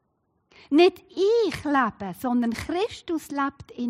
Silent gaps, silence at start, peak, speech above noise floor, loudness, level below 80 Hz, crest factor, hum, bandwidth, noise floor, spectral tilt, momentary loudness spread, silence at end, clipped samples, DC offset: none; 0.7 s; -8 dBFS; 48 dB; -24 LUFS; -56 dBFS; 16 dB; none; 16 kHz; -72 dBFS; -5 dB/octave; 10 LU; 0 s; under 0.1%; under 0.1%